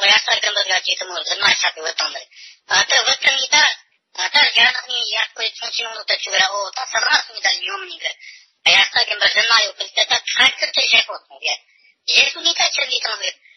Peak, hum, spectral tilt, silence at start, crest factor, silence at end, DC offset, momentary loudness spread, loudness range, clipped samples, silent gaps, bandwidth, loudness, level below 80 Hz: -2 dBFS; none; 4.5 dB/octave; 0 s; 18 dB; 0.25 s; under 0.1%; 12 LU; 4 LU; under 0.1%; none; 8 kHz; -16 LUFS; -66 dBFS